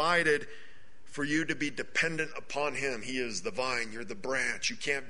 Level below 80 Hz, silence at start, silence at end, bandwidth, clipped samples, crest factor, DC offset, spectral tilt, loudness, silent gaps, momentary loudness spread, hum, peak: -62 dBFS; 0 s; 0 s; 10.5 kHz; under 0.1%; 20 dB; 1%; -3 dB/octave; -32 LUFS; none; 9 LU; none; -12 dBFS